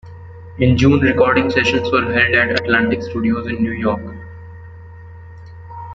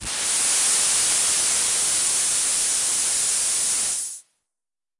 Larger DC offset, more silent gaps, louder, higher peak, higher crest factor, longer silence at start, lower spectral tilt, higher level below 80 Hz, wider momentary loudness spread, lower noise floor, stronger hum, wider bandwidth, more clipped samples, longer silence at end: neither; neither; first, -15 LUFS vs -18 LUFS; first, -2 dBFS vs -8 dBFS; about the same, 16 dB vs 14 dB; about the same, 0.05 s vs 0 s; first, -6.5 dB/octave vs 2 dB/octave; first, -44 dBFS vs -56 dBFS; first, 23 LU vs 4 LU; second, -36 dBFS vs under -90 dBFS; neither; second, 7.8 kHz vs 11.5 kHz; neither; second, 0 s vs 0.8 s